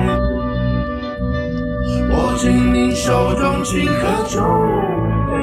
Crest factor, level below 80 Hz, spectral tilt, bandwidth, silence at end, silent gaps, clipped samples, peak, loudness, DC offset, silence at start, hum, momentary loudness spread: 14 dB; -26 dBFS; -6 dB/octave; 14 kHz; 0 s; none; under 0.1%; -4 dBFS; -17 LUFS; under 0.1%; 0 s; none; 6 LU